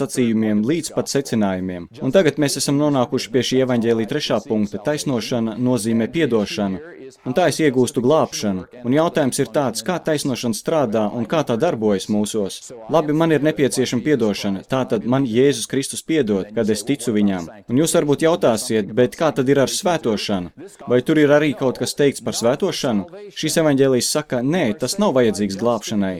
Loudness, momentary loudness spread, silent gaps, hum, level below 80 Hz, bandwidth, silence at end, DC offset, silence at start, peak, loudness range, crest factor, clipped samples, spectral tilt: -19 LUFS; 6 LU; none; none; -54 dBFS; 16.5 kHz; 0 s; under 0.1%; 0 s; -2 dBFS; 2 LU; 18 dB; under 0.1%; -5 dB/octave